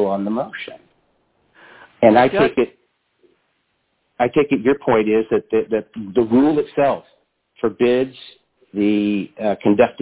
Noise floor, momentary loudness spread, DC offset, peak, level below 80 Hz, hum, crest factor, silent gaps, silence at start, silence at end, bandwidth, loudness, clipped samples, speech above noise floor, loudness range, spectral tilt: -68 dBFS; 10 LU; under 0.1%; 0 dBFS; -54 dBFS; none; 18 dB; none; 0 s; 0 s; 4 kHz; -18 LUFS; under 0.1%; 51 dB; 2 LU; -10.5 dB/octave